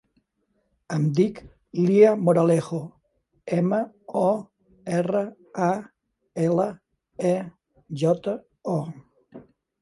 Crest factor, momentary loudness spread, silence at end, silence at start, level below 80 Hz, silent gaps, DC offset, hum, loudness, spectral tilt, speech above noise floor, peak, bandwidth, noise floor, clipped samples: 20 dB; 18 LU; 0.4 s; 0.9 s; -64 dBFS; none; under 0.1%; none; -24 LUFS; -8 dB/octave; 50 dB; -4 dBFS; 11.5 kHz; -72 dBFS; under 0.1%